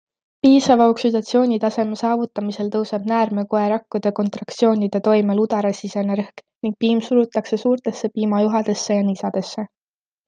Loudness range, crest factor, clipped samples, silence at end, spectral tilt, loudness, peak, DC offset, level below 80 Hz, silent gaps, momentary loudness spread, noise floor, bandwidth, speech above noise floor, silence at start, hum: 3 LU; 16 dB; under 0.1%; 0.6 s; -6 dB/octave; -19 LUFS; -2 dBFS; under 0.1%; -68 dBFS; none; 10 LU; under -90 dBFS; 9.2 kHz; over 71 dB; 0.45 s; none